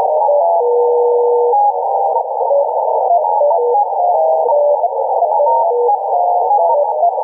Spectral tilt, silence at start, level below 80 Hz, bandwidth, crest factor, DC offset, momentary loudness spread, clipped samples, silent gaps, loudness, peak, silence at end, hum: -7 dB/octave; 0 s; -88 dBFS; 1.1 kHz; 8 dB; under 0.1%; 3 LU; under 0.1%; none; -13 LUFS; -4 dBFS; 0 s; none